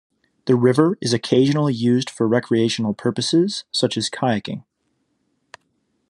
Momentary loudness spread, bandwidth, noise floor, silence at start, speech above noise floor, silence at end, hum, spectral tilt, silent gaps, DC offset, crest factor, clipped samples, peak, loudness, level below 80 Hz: 6 LU; 11.5 kHz; -70 dBFS; 0.45 s; 51 dB; 1.5 s; none; -5.5 dB/octave; none; under 0.1%; 20 dB; under 0.1%; -2 dBFS; -19 LUFS; -66 dBFS